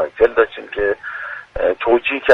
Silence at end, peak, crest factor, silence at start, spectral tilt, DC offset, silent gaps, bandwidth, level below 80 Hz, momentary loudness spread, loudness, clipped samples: 0 s; 0 dBFS; 16 dB; 0 s; -5.5 dB/octave; under 0.1%; none; 5.2 kHz; -42 dBFS; 12 LU; -18 LUFS; under 0.1%